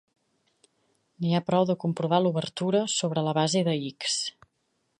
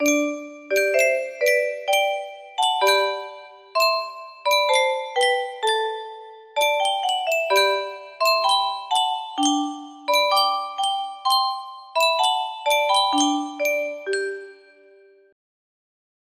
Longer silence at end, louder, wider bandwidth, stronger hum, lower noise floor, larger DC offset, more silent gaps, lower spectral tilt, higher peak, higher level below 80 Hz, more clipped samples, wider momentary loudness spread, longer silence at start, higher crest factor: second, 0.7 s vs 1.8 s; second, -26 LUFS vs -21 LUFS; second, 10 kHz vs 15.5 kHz; neither; first, -75 dBFS vs -52 dBFS; neither; neither; first, -5 dB/octave vs 0.5 dB/octave; about the same, -8 dBFS vs -6 dBFS; about the same, -72 dBFS vs -76 dBFS; neither; second, 5 LU vs 12 LU; first, 1.2 s vs 0 s; about the same, 20 dB vs 18 dB